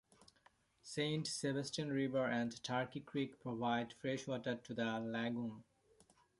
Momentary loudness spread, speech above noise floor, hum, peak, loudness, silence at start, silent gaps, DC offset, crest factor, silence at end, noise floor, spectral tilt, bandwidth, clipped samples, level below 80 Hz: 6 LU; 32 dB; none; -24 dBFS; -41 LUFS; 0.85 s; none; under 0.1%; 18 dB; 0.8 s; -73 dBFS; -5 dB/octave; 11.5 kHz; under 0.1%; -78 dBFS